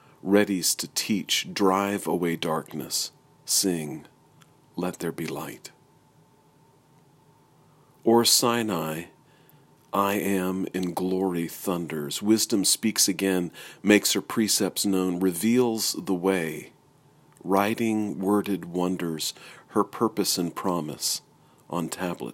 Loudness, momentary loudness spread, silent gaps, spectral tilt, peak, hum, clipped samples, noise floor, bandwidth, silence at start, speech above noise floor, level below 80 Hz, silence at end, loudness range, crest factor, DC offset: -25 LUFS; 12 LU; none; -3.5 dB/octave; -4 dBFS; none; under 0.1%; -59 dBFS; 16.5 kHz; 0.25 s; 34 dB; -68 dBFS; 0 s; 7 LU; 24 dB; under 0.1%